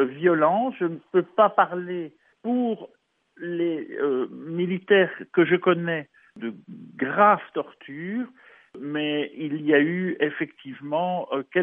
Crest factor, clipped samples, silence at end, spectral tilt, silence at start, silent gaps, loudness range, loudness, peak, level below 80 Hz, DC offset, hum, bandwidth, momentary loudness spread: 20 dB; under 0.1%; 0 s; -9.5 dB/octave; 0 s; none; 4 LU; -24 LUFS; -4 dBFS; -80 dBFS; under 0.1%; none; 3.7 kHz; 16 LU